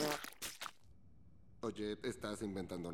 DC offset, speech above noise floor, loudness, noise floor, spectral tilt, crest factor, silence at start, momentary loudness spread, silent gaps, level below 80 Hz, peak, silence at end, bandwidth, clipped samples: under 0.1%; 23 dB; -44 LUFS; -66 dBFS; -4 dB/octave; 22 dB; 0 s; 5 LU; none; -68 dBFS; -22 dBFS; 0 s; 17.5 kHz; under 0.1%